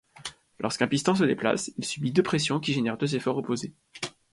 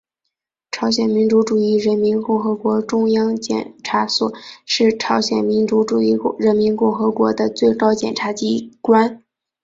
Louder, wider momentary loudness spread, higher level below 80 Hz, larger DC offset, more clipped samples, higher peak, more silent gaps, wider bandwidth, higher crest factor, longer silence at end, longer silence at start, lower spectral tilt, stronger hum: second, -27 LUFS vs -17 LUFS; first, 13 LU vs 7 LU; second, -64 dBFS vs -58 dBFS; neither; neither; second, -8 dBFS vs -2 dBFS; neither; first, 11.5 kHz vs 7.8 kHz; about the same, 20 dB vs 16 dB; second, 0.2 s vs 0.45 s; second, 0.15 s vs 0.75 s; about the same, -5 dB/octave vs -5 dB/octave; neither